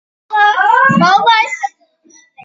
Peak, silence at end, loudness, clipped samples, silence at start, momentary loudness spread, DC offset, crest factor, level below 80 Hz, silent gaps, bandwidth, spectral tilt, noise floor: 0 dBFS; 0.75 s; -10 LUFS; under 0.1%; 0.3 s; 11 LU; under 0.1%; 12 dB; -62 dBFS; none; 7.8 kHz; -4.5 dB/octave; -48 dBFS